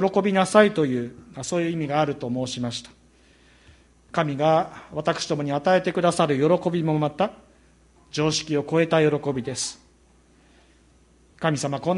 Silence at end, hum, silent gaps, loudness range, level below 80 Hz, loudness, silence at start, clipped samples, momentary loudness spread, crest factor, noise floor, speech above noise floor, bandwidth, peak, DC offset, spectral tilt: 0 s; none; none; 4 LU; -58 dBFS; -23 LUFS; 0 s; under 0.1%; 10 LU; 20 dB; -57 dBFS; 35 dB; 11.5 kHz; -4 dBFS; under 0.1%; -5 dB/octave